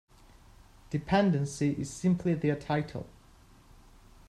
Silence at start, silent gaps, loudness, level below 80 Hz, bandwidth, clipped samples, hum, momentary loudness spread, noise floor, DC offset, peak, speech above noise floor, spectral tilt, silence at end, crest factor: 0.9 s; none; -30 LUFS; -56 dBFS; 12 kHz; under 0.1%; none; 13 LU; -57 dBFS; under 0.1%; -12 dBFS; 28 dB; -6.5 dB/octave; 1.2 s; 20 dB